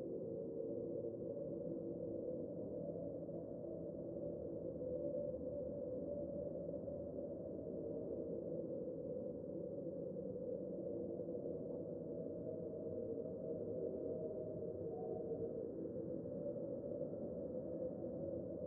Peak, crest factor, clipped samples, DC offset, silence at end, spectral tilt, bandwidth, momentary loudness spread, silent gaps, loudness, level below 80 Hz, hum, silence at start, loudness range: -32 dBFS; 14 dB; under 0.1%; under 0.1%; 0 s; -6.5 dB/octave; 1.8 kHz; 3 LU; none; -46 LUFS; -72 dBFS; none; 0 s; 1 LU